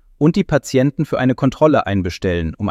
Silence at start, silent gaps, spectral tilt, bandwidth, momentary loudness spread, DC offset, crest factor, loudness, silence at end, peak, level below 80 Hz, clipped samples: 0.2 s; none; -7 dB/octave; 14.5 kHz; 6 LU; under 0.1%; 16 dB; -17 LUFS; 0 s; 0 dBFS; -38 dBFS; under 0.1%